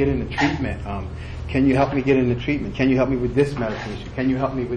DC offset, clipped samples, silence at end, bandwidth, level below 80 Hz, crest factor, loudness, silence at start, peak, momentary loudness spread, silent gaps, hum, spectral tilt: under 0.1%; under 0.1%; 0 s; 9.8 kHz; -36 dBFS; 16 dB; -21 LUFS; 0 s; -6 dBFS; 11 LU; none; none; -7.5 dB/octave